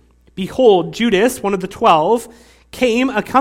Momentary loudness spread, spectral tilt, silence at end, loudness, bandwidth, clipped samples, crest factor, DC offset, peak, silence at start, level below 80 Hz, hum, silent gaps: 9 LU; -5 dB/octave; 0 s; -15 LUFS; 16.5 kHz; under 0.1%; 16 dB; under 0.1%; 0 dBFS; 0.35 s; -46 dBFS; none; none